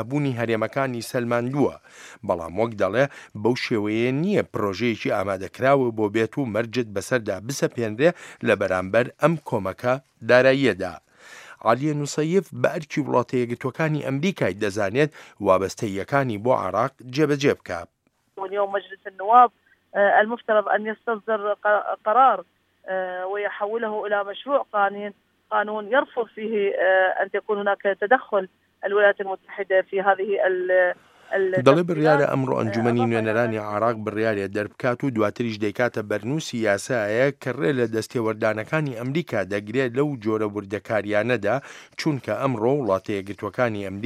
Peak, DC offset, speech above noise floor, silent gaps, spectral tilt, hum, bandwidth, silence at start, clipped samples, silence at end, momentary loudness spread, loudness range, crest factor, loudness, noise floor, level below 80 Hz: 0 dBFS; under 0.1%; 23 dB; none; -6 dB/octave; none; 15 kHz; 0 s; under 0.1%; 0 s; 9 LU; 4 LU; 22 dB; -23 LUFS; -45 dBFS; -66 dBFS